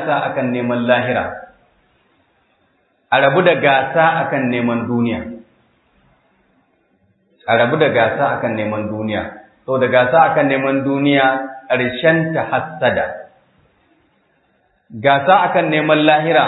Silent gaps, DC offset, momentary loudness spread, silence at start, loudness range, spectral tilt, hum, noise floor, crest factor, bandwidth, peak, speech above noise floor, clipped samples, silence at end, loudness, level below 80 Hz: none; under 0.1%; 11 LU; 0 s; 5 LU; -10 dB/octave; none; -61 dBFS; 16 dB; 4.1 kHz; 0 dBFS; 45 dB; under 0.1%; 0 s; -15 LUFS; -56 dBFS